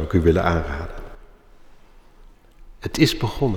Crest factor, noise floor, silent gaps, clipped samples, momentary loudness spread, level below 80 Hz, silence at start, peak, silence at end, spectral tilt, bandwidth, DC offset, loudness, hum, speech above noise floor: 20 dB; -48 dBFS; none; under 0.1%; 17 LU; -34 dBFS; 0 s; -4 dBFS; 0 s; -6 dB/octave; 18.5 kHz; under 0.1%; -21 LUFS; none; 28 dB